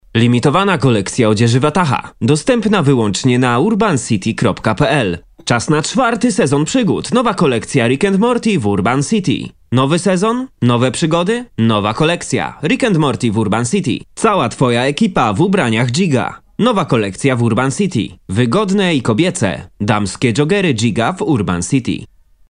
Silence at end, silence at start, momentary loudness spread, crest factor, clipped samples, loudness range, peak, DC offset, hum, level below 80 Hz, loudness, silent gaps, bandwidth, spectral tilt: 0.45 s; 0.15 s; 5 LU; 14 dB; under 0.1%; 2 LU; 0 dBFS; 0.2%; none; -44 dBFS; -14 LUFS; none; 10.5 kHz; -5.5 dB/octave